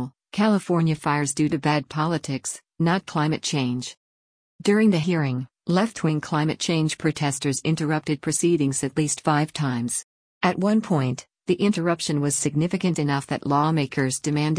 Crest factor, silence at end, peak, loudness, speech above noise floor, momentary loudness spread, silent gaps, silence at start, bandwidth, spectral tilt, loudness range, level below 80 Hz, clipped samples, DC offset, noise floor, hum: 16 dB; 0 s; -8 dBFS; -23 LUFS; over 67 dB; 6 LU; 3.97-4.59 s, 10.04-10.41 s; 0 s; 10.5 kHz; -5 dB/octave; 1 LU; -60 dBFS; under 0.1%; under 0.1%; under -90 dBFS; none